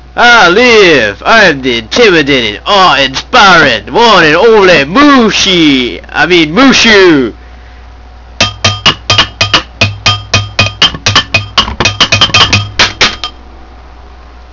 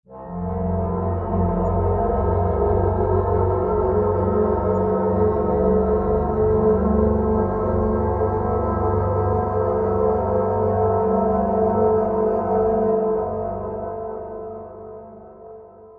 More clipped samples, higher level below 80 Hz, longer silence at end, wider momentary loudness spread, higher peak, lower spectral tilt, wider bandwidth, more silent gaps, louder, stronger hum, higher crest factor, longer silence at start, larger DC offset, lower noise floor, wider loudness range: first, 6% vs under 0.1%; about the same, -30 dBFS vs -32 dBFS; about the same, 0.1 s vs 0 s; about the same, 8 LU vs 10 LU; first, 0 dBFS vs -6 dBFS; second, -3.5 dB/octave vs -12.5 dB/octave; first, 6 kHz vs 2.8 kHz; neither; first, -5 LUFS vs -21 LUFS; neither; second, 6 dB vs 14 dB; about the same, 0.15 s vs 0.1 s; first, 0.9% vs under 0.1%; second, -30 dBFS vs -42 dBFS; about the same, 4 LU vs 3 LU